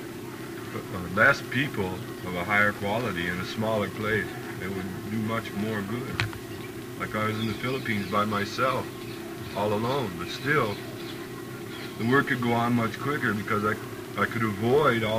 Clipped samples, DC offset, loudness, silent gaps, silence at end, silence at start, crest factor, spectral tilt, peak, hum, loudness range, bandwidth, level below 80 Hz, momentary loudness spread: under 0.1%; under 0.1%; -28 LUFS; none; 0 s; 0 s; 24 dB; -5.5 dB/octave; -4 dBFS; none; 4 LU; 15.5 kHz; -56 dBFS; 14 LU